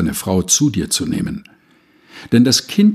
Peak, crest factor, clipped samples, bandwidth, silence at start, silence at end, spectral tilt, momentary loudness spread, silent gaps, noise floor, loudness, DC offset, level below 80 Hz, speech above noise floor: -2 dBFS; 16 dB; under 0.1%; 15 kHz; 0 s; 0 s; -4 dB/octave; 10 LU; none; -53 dBFS; -15 LUFS; under 0.1%; -42 dBFS; 37 dB